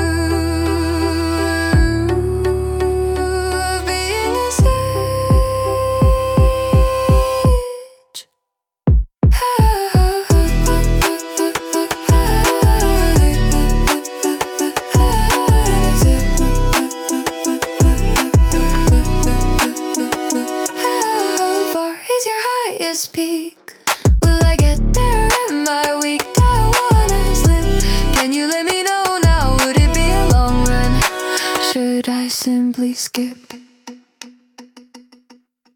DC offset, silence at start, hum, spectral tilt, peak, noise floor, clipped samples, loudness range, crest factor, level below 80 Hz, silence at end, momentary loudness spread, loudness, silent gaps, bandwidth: under 0.1%; 0 s; none; -5 dB/octave; 0 dBFS; -78 dBFS; under 0.1%; 3 LU; 14 dB; -18 dBFS; 0.75 s; 6 LU; -16 LUFS; none; 18 kHz